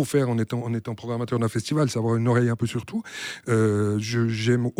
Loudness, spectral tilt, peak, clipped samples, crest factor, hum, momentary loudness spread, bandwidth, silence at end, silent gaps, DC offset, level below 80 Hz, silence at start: -25 LUFS; -6.5 dB/octave; -10 dBFS; under 0.1%; 14 dB; none; 9 LU; 15 kHz; 0.1 s; none; under 0.1%; -60 dBFS; 0 s